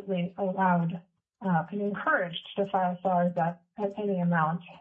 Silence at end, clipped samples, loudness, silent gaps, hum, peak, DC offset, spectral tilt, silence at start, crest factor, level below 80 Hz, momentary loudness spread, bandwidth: 0.05 s; under 0.1%; -29 LUFS; none; none; -12 dBFS; under 0.1%; -9.5 dB/octave; 0 s; 16 dB; -76 dBFS; 8 LU; 3.8 kHz